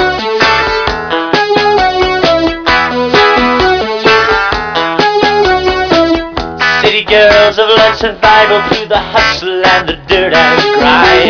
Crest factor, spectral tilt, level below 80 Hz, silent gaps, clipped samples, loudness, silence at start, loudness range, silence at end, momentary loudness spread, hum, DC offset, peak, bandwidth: 8 dB; -4 dB/octave; -30 dBFS; none; 0.4%; -8 LUFS; 0 s; 2 LU; 0 s; 6 LU; none; 0.1%; 0 dBFS; 5.4 kHz